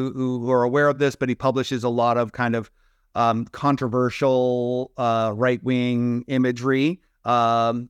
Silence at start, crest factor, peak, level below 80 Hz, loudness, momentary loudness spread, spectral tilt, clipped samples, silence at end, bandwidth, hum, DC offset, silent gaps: 0 s; 14 dB; -8 dBFS; -60 dBFS; -22 LUFS; 5 LU; -7 dB/octave; under 0.1%; 0 s; 11 kHz; none; under 0.1%; none